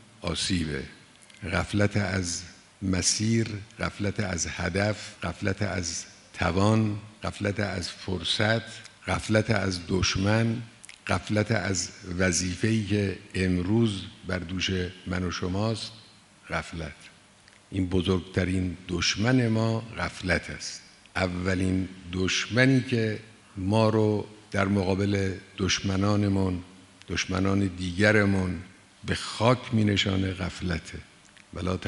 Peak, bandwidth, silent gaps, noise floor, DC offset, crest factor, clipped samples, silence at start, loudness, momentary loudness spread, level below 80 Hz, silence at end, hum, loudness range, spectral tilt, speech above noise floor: -4 dBFS; 11.5 kHz; none; -56 dBFS; under 0.1%; 22 dB; under 0.1%; 0.2 s; -27 LUFS; 12 LU; -50 dBFS; 0 s; none; 4 LU; -5 dB/octave; 29 dB